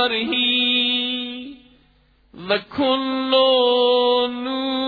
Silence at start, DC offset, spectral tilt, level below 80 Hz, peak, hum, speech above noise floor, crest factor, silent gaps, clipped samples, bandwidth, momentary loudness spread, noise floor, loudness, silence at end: 0 s; under 0.1%; -5.5 dB/octave; -60 dBFS; -6 dBFS; none; 38 dB; 16 dB; none; under 0.1%; 4.9 kHz; 11 LU; -57 dBFS; -18 LUFS; 0 s